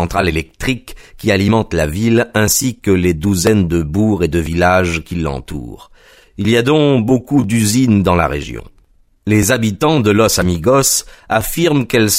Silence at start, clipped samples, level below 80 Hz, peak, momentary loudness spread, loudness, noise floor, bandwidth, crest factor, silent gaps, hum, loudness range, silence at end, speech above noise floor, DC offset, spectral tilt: 0 s; under 0.1%; -32 dBFS; 0 dBFS; 9 LU; -14 LUFS; -51 dBFS; 16 kHz; 14 dB; none; none; 2 LU; 0 s; 37 dB; under 0.1%; -5 dB/octave